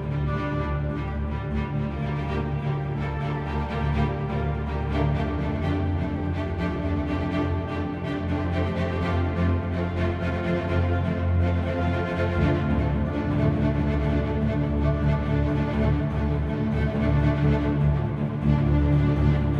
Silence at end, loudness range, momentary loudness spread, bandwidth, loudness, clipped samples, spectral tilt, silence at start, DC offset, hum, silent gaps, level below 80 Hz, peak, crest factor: 0 s; 4 LU; 6 LU; 6.6 kHz; -25 LUFS; under 0.1%; -9 dB/octave; 0 s; under 0.1%; none; none; -32 dBFS; -10 dBFS; 14 dB